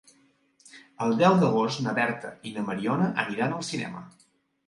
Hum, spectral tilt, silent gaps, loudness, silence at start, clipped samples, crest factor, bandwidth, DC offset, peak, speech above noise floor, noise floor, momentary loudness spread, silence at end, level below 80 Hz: none; -6 dB/octave; none; -26 LUFS; 0.75 s; under 0.1%; 22 dB; 11.5 kHz; under 0.1%; -6 dBFS; 38 dB; -64 dBFS; 15 LU; 0.6 s; -70 dBFS